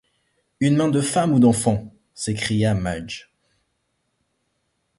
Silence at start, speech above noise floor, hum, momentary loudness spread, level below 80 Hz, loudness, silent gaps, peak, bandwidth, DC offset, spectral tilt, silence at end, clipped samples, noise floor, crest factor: 0.6 s; 53 dB; none; 14 LU; -48 dBFS; -20 LUFS; none; -6 dBFS; 11.5 kHz; under 0.1%; -5.5 dB/octave; 1.8 s; under 0.1%; -72 dBFS; 18 dB